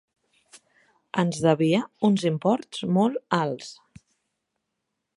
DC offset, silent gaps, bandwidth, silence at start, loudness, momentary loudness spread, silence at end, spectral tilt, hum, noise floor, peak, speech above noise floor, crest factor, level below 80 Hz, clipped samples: under 0.1%; none; 11.5 kHz; 1.15 s; -24 LUFS; 9 LU; 1.45 s; -6.5 dB/octave; none; -81 dBFS; -6 dBFS; 57 dB; 20 dB; -66 dBFS; under 0.1%